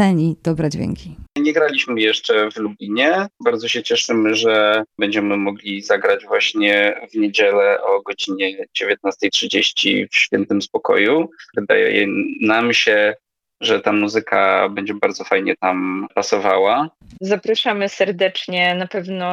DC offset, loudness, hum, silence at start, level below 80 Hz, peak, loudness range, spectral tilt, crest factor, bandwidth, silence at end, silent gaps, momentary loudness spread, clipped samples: under 0.1%; -17 LUFS; none; 0 s; -54 dBFS; -2 dBFS; 2 LU; -4 dB/octave; 16 dB; 10.5 kHz; 0 s; none; 8 LU; under 0.1%